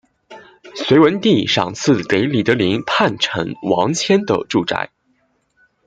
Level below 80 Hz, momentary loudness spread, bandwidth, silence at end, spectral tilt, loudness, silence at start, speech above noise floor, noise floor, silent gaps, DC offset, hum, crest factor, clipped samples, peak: -56 dBFS; 9 LU; 9.2 kHz; 1 s; -5 dB/octave; -16 LUFS; 0.3 s; 47 dB; -63 dBFS; none; under 0.1%; none; 16 dB; under 0.1%; 0 dBFS